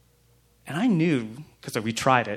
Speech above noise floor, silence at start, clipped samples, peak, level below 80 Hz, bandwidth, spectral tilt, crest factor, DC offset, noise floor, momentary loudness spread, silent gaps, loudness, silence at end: 37 dB; 0.65 s; under 0.1%; -4 dBFS; -62 dBFS; 15.5 kHz; -5.5 dB/octave; 22 dB; under 0.1%; -61 dBFS; 15 LU; none; -25 LUFS; 0 s